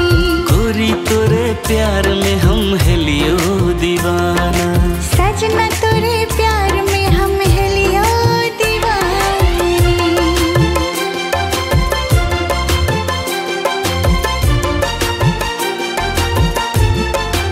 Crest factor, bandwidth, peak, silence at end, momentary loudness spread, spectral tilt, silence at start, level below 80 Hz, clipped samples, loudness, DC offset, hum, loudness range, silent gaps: 14 dB; 16.5 kHz; 0 dBFS; 0 s; 4 LU; -5 dB/octave; 0 s; -20 dBFS; under 0.1%; -14 LUFS; under 0.1%; none; 2 LU; none